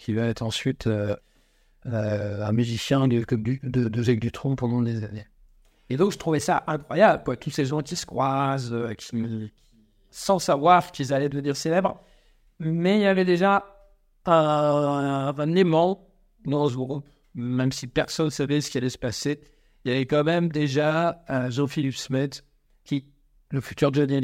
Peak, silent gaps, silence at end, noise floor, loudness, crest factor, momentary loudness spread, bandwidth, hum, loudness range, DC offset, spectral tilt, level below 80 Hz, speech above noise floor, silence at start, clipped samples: -4 dBFS; none; 0 s; -61 dBFS; -24 LUFS; 20 dB; 12 LU; 16 kHz; none; 4 LU; under 0.1%; -6 dB/octave; -54 dBFS; 38 dB; 0 s; under 0.1%